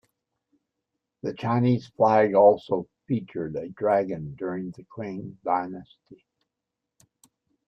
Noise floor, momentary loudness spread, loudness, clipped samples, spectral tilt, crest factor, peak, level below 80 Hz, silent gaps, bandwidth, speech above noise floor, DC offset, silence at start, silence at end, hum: -85 dBFS; 17 LU; -25 LUFS; under 0.1%; -9 dB/octave; 20 dB; -6 dBFS; -66 dBFS; none; 8 kHz; 61 dB; under 0.1%; 1.25 s; 1.55 s; none